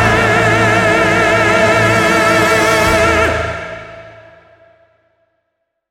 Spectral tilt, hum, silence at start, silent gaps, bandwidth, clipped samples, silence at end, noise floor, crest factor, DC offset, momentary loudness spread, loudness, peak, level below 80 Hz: -4.5 dB/octave; none; 0 s; none; 17.5 kHz; under 0.1%; 1.8 s; -71 dBFS; 12 dB; under 0.1%; 9 LU; -11 LUFS; 0 dBFS; -34 dBFS